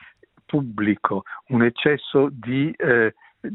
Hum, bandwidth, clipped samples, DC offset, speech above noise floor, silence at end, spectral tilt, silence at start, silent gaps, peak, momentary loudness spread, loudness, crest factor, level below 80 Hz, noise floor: none; 4.1 kHz; under 0.1%; under 0.1%; 30 dB; 0 s; -11 dB/octave; 0.55 s; none; -2 dBFS; 7 LU; -22 LUFS; 20 dB; -62 dBFS; -51 dBFS